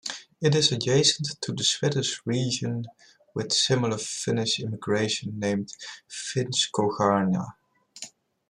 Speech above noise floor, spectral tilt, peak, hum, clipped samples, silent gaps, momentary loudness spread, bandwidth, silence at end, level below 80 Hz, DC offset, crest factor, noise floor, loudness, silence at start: 20 dB; -4 dB/octave; -8 dBFS; none; under 0.1%; none; 16 LU; 12 kHz; 0.4 s; -66 dBFS; under 0.1%; 20 dB; -46 dBFS; -25 LUFS; 0.05 s